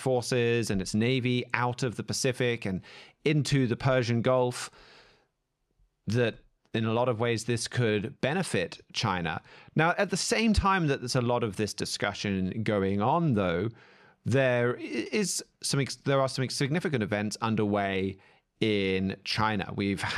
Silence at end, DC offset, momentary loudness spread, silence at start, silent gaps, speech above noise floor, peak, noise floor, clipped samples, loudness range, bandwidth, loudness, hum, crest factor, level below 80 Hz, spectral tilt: 0 s; under 0.1%; 7 LU; 0 s; none; 50 dB; -8 dBFS; -78 dBFS; under 0.1%; 3 LU; 14 kHz; -28 LUFS; none; 22 dB; -50 dBFS; -5 dB/octave